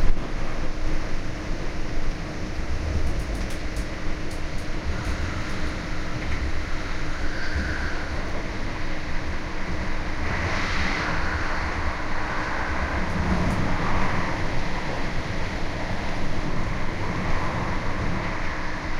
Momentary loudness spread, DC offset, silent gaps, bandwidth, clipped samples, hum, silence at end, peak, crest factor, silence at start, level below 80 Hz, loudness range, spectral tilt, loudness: 7 LU; under 0.1%; none; 7.6 kHz; under 0.1%; none; 0 s; -6 dBFS; 18 dB; 0 s; -28 dBFS; 5 LU; -5.5 dB/octave; -29 LUFS